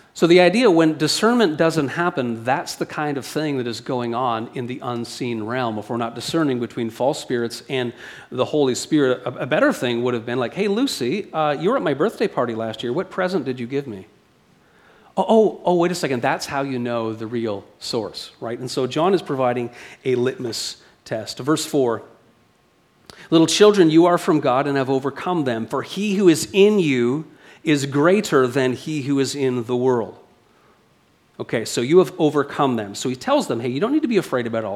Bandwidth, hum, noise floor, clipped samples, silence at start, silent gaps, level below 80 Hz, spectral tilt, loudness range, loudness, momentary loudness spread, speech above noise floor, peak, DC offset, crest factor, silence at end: 15 kHz; none; -59 dBFS; under 0.1%; 0.15 s; none; -64 dBFS; -5 dB/octave; 7 LU; -20 LUFS; 11 LU; 39 dB; 0 dBFS; under 0.1%; 20 dB; 0 s